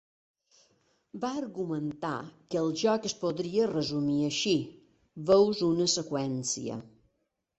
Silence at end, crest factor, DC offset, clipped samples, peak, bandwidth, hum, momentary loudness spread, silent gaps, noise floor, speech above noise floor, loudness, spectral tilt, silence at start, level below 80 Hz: 0.7 s; 20 dB; under 0.1%; under 0.1%; -10 dBFS; 8.4 kHz; none; 12 LU; none; -79 dBFS; 50 dB; -29 LUFS; -4.5 dB/octave; 1.15 s; -68 dBFS